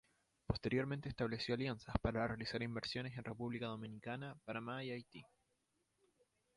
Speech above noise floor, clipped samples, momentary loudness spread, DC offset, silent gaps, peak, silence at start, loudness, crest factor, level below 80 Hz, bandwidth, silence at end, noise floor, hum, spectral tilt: 41 dB; under 0.1%; 8 LU; under 0.1%; none; -20 dBFS; 0.5 s; -43 LUFS; 24 dB; -58 dBFS; 11.5 kHz; 1.3 s; -84 dBFS; none; -6.5 dB/octave